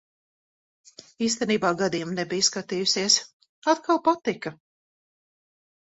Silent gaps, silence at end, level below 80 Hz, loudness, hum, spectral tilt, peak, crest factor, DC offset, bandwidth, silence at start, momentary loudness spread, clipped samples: 3.33-3.40 s, 3.49-3.62 s; 1.45 s; -68 dBFS; -24 LUFS; none; -2.5 dB/octave; -6 dBFS; 22 dB; under 0.1%; 8.4 kHz; 1.2 s; 9 LU; under 0.1%